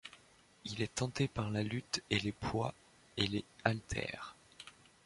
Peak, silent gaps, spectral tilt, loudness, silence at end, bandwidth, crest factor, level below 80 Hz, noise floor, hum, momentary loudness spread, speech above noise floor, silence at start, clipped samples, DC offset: -12 dBFS; none; -4.5 dB/octave; -38 LUFS; 0.35 s; 11.5 kHz; 26 dB; -58 dBFS; -65 dBFS; none; 18 LU; 27 dB; 0.05 s; under 0.1%; under 0.1%